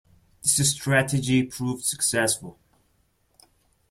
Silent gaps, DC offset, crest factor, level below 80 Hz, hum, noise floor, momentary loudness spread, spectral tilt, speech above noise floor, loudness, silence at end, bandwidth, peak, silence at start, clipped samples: none; under 0.1%; 20 dB; -58 dBFS; none; -67 dBFS; 8 LU; -3.5 dB/octave; 43 dB; -23 LUFS; 1.4 s; 16 kHz; -6 dBFS; 0.45 s; under 0.1%